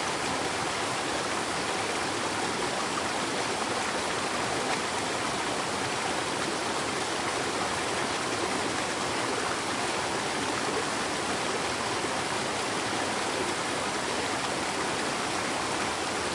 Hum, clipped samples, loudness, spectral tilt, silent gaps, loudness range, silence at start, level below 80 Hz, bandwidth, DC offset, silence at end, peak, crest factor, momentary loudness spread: none; under 0.1%; -29 LUFS; -2.5 dB/octave; none; 0 LU; 0 s; -60 dBFS; 11.5 kHz; under 0.1%; 0 s; -14 dBFS; 16 dB; 1 LU